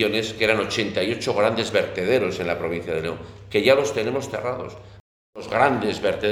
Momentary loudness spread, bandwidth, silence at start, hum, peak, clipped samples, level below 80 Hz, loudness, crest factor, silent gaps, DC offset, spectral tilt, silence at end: 9 LU; 15 kHz; 0 s; none; -2 dBFS; under 0.1%; -52 dBFS; -22 LUFS; 20 dB; 5.00-5.33 s; under 0.1%; -4.5 dB/octave; 0 s